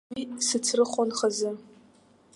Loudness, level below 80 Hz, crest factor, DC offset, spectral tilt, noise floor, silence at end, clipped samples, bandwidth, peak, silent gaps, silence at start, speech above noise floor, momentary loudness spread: -27 LUFS; -72 dBFS; 18 dB; under 0.1%; -2 dB/octave; -59 dBFS; 0.75 s; under 0.1%; 11.5 kHz; -10 dBFS; none; 0.1 s; 32 dB; 10 LU